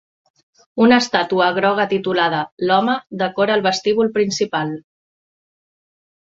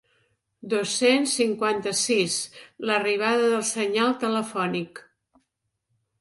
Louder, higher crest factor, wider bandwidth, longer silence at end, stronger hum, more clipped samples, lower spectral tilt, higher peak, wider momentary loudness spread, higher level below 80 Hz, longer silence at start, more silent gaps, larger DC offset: first, -17 LUFS vs -24 LUFS; about the same, 18 dB vs 18 dB; second, 7.8 kHz vs 11.5 kHz; first, 1.5 s vs 1.2 s; neither; neither; first, -4.5 dB/octave vs -3 dB/octave; first, -2 dBFS vs -8 dBFS; about the same, 9 LU vs 8 LU; first, -62 dBFS vs -72 dBFS; about the same, 0.75 s vs 0.65 s; first, 2.52-2.57 s vs none; neither